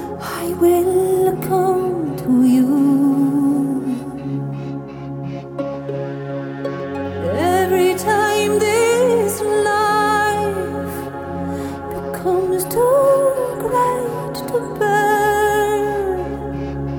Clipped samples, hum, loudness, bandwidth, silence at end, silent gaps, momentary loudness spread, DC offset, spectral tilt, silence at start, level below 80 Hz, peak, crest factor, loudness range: under 0.1%; none; -18 LUFS; 19.5 kHz; 0 s; none; 12 LU; under 0.1%; -5.5 dB/octave; 0 s; -44 dBFS; -4 dBFS; 14 dB; 7 LU